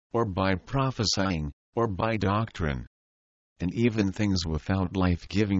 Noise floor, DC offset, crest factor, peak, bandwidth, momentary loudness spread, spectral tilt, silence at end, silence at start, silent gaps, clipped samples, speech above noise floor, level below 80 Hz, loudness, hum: under -90 dBFS; under 0.1%; 16 dB; -10 dBFS; 8 kHz; 7 LU; -5.5 dB/octave; 0 s; 0.15 s; 1.53-1.73 s, 2.87-3.56 s; under 0.1%; over 63 dB; -44 dBFS; -28 LUFS; none